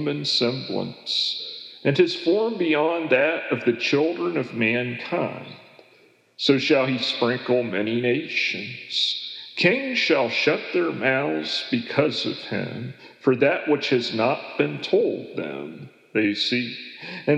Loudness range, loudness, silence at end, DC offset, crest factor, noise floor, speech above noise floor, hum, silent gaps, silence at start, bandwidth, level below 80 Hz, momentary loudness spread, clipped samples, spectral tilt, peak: 2 LU; -23 LUFS; 0 s; under 0.1%; 18 dB; -57 dBFS; 34 dB; none; none; 0 s; 10 kHz; -84 dBFS; 10 LU; under 0.1%; -5 dB/octave; -4 dBFS